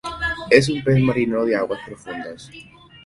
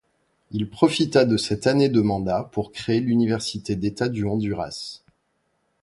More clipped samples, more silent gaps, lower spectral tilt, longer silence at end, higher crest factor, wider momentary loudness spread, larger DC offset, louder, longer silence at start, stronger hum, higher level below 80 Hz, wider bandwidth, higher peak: neither; neither; about the same, -6 dB/octave vs -6 dB/octave; second, 0.45 s vs 0.85 s; about the same, 20 dB vs 20 dB; first, 18 LU vs 11 LU; neither; first, -19 LUFS vs -23 LUFS; second, 0.05 s vs 0.5 s; neither; about the same, -46 dBFS vs -50 dBFS; about the same, 11.5 kHz vs 11.5 kHz; about the same, 0 dBFS vs -2 dBFS